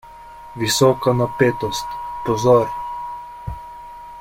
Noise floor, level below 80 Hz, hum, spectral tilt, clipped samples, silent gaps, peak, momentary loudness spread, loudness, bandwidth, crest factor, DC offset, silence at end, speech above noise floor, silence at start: -39 dBFS; -44 dBFS; none; -5 dB/octave; under 0.1%; none; -2 dBFS; 21 LU; -19 LUFS; 16.5 kHz; 18 dB; under 0.1%; 0 s; 22 dB; 0.05 s